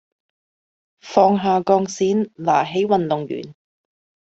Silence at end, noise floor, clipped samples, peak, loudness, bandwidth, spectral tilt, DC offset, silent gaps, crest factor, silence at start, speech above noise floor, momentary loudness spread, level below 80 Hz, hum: 0.7 s; under -90 dBFS; under 0.1%; -2 dBFS; -19 LUFS; 8 kHz; -6 dB/octave; under 0.1%; none; 18 dB; 1.05 s; over 72 dB; 8 LU; -62 dBFS; none